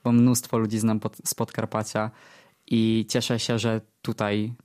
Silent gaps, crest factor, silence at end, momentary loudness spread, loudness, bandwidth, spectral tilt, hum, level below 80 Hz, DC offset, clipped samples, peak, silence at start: none; 16 dB; 0.1 s; 8 LU; -25 LUFS; 15.5 kHz; -5 dB/octave; none; -62 dBFS; under 0.1%; under 0.1%; -8 dBFS; 0.05 s